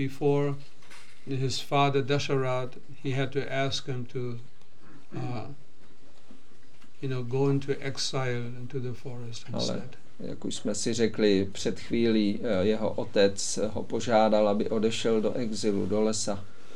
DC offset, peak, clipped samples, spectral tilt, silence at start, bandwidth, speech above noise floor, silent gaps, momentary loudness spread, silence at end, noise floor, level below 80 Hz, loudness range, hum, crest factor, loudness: 3%; -10 dBFS; under 0.1%; -5 dB/octave; 0 s; 13.5 kHz; 30 dB; none; 14 LU; 0 s; -58 dBFS; -64 dBFS; 8 LU; none; 20 dB; -29 LUFS